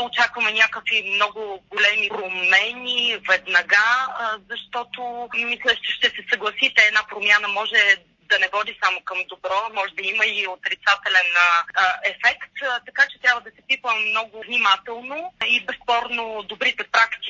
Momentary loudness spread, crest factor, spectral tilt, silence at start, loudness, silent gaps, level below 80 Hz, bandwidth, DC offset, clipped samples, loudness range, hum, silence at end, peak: 10 LU; 20 dB; 0 dB/octave; 0 s; -19 LUFS; none; -66 dBFS; 7.6 kHz; under 0.1%; under 0.1%; 3 LU; none; 0 s; -2 dBFS